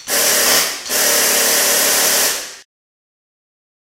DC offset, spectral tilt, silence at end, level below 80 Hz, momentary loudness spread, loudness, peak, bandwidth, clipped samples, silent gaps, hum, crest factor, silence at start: under 0.1%; 1 dB/octave; 1.35 s; -54 dBFS; 5 LU; -12 LUFS; -2 dBFS; 16 kHz; under 0.1%; none; none; 16 dB; 0 s